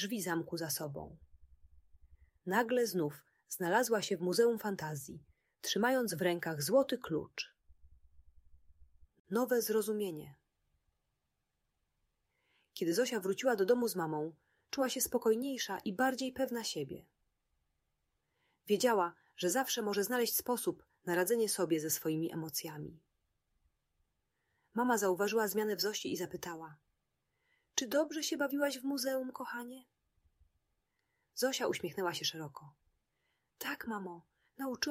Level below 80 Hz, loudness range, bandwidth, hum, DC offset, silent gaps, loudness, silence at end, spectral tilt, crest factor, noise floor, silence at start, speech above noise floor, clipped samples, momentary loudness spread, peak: -72 dBFS; 6 LU; 16 kHz; none; under 0.1%; 9.20-9.25 s; -35 LUFS; 0 s; -3.5 dB/octave; 22 dB; -85 dBFS; 0 s; 50 dB; under 0.1%; 14 LU; -16 dBFS